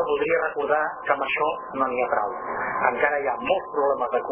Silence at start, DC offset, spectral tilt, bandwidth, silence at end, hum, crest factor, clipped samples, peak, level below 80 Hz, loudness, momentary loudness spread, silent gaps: 0 s; under 0.1%; -7.5 dB/octave; 3.6 kHz; 0 s; none; 18 dB; under 0.1%; -6 dBFS; -60 dBFS; -24 LUFS; 4 LU; none